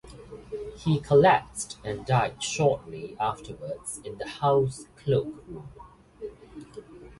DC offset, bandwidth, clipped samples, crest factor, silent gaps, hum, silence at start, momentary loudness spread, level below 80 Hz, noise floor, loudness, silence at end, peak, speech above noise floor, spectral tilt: under 0.1%; 11.5 kHz; under 0.1%; 20 dB; none; none; 0.05 s; 23 LU; -54 dBFS; -45 dBFS; -26 LUFS; 0.05 s; -8 dBFS; 19 dB; -5.5 dB/octave